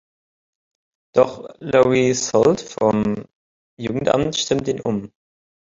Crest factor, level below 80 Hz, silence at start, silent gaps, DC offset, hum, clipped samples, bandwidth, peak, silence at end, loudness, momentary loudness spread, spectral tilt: 18 dB; -52 dBFS; 1.15 s; 3.35-3.77 s; under 0.1%; none; under 0.1%; 7.8 kHz; -2 dBFS; 0.6 s; -19 LUFS; 11 LU; -5 dB/octave